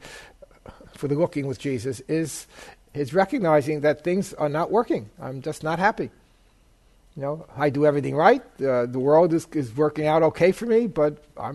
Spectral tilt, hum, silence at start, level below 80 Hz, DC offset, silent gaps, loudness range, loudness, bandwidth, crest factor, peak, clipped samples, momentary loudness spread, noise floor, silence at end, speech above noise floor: -6.5 dB/octave; none; 0.05 s; -56 dBFS; under 0.1%; none; 6 LU; -23 LUFS; 12.5 kHz; 20 dB; -4 dBFS; under 0.1%; 14 LU; -58 dBFS; 0 s; 35 dB